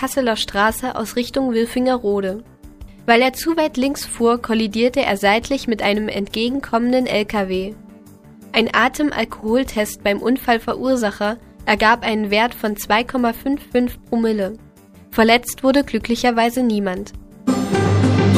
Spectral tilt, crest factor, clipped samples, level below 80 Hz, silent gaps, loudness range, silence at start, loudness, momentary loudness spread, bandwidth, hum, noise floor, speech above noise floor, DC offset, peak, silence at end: -5 dB/octave; 18 dB; under 0.1%; -42 dBFS; none; 2 LU; 0 s; -18 LUFS; 9 LU; 15.5 kHz; none; -43 dBFS; 25 dB; under 0.1%; 0 dBFS; 0 s